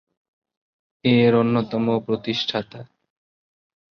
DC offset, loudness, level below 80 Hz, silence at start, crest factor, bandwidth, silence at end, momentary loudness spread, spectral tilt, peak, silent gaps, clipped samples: under 0.1%; -21 LUFS; -60 dBFS; 1.05 s; 18 dB; 6.6 kHz; 1.15 s; 10 LU; -7 dB/octave; -6 dBFS; none; under 0.1%